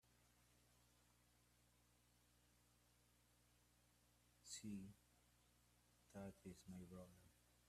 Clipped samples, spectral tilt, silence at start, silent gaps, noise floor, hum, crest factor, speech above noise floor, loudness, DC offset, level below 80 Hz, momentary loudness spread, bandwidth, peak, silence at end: under 0.1%; -4.5 dB/octave; 0.05 s; none; -78 dBFS; 60 Hz at -80 dBFS; 22 dB; 21 dB; -59 LUFS; under 0.1%; -82 dBFS; 10 LU; 14.5 kHz; -42 dBFS; 0 s